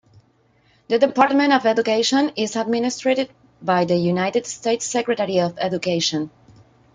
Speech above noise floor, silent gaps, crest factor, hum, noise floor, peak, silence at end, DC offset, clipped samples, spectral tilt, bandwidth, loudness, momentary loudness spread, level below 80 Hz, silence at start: 40 dB; none; 18 dB; none; -59 dBFS; -2 dBFS; 0.65 s; under 0.1%; under 0.1%; -4.5 dB/octave; 9.6 kHz; -20 LUFS; 7 LU; -64 dBFS; 0.9 s